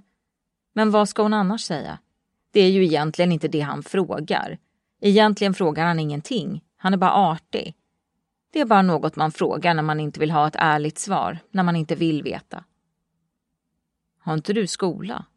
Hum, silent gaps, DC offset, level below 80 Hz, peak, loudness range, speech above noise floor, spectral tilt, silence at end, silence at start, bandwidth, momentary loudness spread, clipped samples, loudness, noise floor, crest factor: none; none; under 0.1%; -64 dBFS; -4 dBFS; 6 LU; 59 dB; -6 dB/octave; 0.15 s; 0.75 s; 11.5 kHz; 13 LU; under 0.1%; -21 LUFS; -80 dBFS; 20 dB